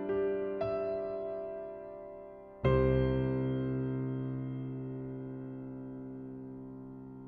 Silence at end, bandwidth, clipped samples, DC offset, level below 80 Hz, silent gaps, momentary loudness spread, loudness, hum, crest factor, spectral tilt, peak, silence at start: 0 s; 5 kHz; under 0.1%; under 0.1%; -48 dBFS; none; 17 LU; -35 LUFS; none; 20 dB; -11 dB/octave; -16 dBFS; 0 s